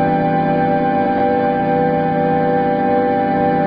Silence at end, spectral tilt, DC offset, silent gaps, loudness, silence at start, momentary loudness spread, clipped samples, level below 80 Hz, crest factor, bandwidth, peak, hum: 0 s; -10.5 dB/octave; under 0.1%; none; -16 LUFS; 0 s; 1 LU; under 0.1%; -44 dBFS; 10 dB; 5.2 kHz; -4 dBFS; none